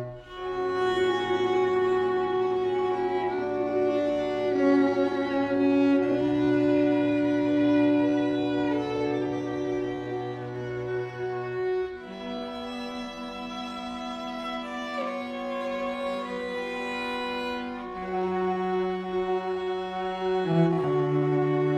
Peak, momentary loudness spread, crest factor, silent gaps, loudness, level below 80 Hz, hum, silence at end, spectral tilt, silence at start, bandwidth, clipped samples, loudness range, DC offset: -10 dBFS; 12 LU; 16 dB; none; -27 LUFS; -58 dBFS; none; 0 s; -7 dB/octave; 0 s; 8.8 kHz; under 0.1%; 9 LU; under 0.1%